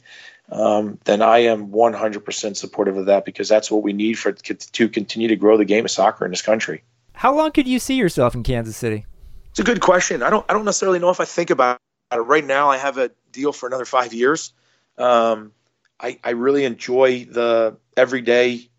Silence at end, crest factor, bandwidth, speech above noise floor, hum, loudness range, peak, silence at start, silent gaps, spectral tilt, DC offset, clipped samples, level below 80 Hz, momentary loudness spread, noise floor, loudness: 0.2 s; 16 dB; 16 kHz; 26 dB; none; 3 LU; -2 dBFS; 0.1 s; none; -4 dB/octave; under 0.1%; under 0.1%; -44 dBFS; 10 LU; -44 dBFS; -18 LUFS